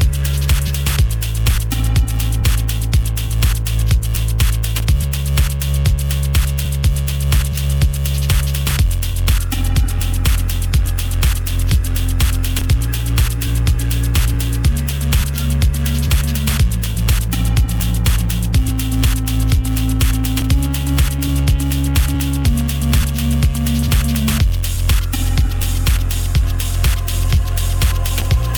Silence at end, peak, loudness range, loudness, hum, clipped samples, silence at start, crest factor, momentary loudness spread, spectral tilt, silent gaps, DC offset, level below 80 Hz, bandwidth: 0 s; -2 dBFS; 1 LU; -17 LUFS; none; under 0.1%; 0 s; 12 dB; 2 LU; -4.5 dB/octave; none; under 0.1%; -18 dBFS; over 20 kHz